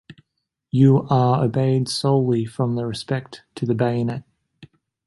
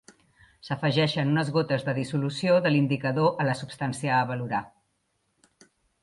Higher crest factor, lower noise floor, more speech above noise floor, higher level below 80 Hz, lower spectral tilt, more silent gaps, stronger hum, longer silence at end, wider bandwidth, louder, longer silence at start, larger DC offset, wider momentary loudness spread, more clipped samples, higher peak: about the same, 18 dB vs 16 dB; first, -78 dBFS vs -74 dBFS; first, 58 dB vs 49 dB; first, -56 dBFS vs -66 dBFS; about the same, -7.5 dB/octave vs -6.5 dB/octave; neither; neither; second, 0.4 s vs 1.35 s; about the same, 11.5 kHz vs 11.5 kHz; first, -20 LUFS vs -26 LUFS; second, 0.1 s vs 0.65 s; neither; first, 11 LU vs 8 LU; neither; first, -4 dBFS vs -10 dBFS